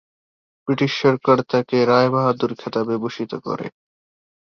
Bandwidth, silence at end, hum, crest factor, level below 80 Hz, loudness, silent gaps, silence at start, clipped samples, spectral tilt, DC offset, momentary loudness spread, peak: 6.8 kHz; 0.85 s; none; 18 dB; -62 dBFS; -20 LUFS; none; 0.65 s; under 0.1%; -7 dB/octave; under 0.1%; 12 LU; -2 dBFS